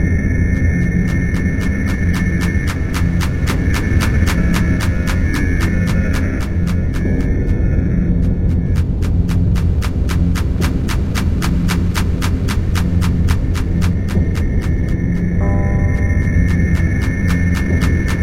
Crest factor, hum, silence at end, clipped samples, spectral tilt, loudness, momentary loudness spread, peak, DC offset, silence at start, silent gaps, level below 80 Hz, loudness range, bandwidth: 14 dB; none; 0 s; under 0.1%; -7 dB/octave; -17 LUFS; 3 LU; 0 dBFS; 1%; 0 s; none; -20 dBFS; 1 LU; 15.5 kHz